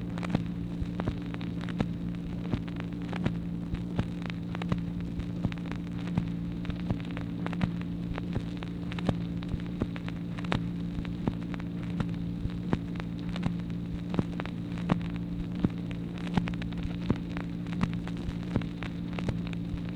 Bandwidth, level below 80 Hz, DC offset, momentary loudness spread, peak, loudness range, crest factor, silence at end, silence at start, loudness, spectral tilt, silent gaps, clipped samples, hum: 8.8 kHz; -44 dBFS; under 0.1%; 4 LU; -8 dBFS; 1 LU; 26 dB; 0 s; 0 s; -34 LUFS; -8 dB/octave; none; under 0.1%; none